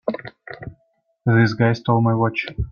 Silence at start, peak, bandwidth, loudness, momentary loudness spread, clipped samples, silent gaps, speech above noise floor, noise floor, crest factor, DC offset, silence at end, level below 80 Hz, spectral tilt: 0.05 s; -4 dBFS; 6.8 kHz; -19 LUFS; 19 LU; under 0.1%; none; 48 dB; -66 dBFS; 18 dB; under 0.1%; 0 s; -40 dBFS; -8 dB/octave